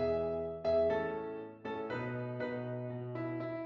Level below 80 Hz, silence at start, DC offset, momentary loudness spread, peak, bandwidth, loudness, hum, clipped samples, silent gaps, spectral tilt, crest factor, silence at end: -66 dBFS; 0 s; under 0.1%; 10 LU; -22 dBFS; 6.6 kHz; -37 LUFS; none; under 0.1%; none; -9 dB/octave; 14 dB; 0 s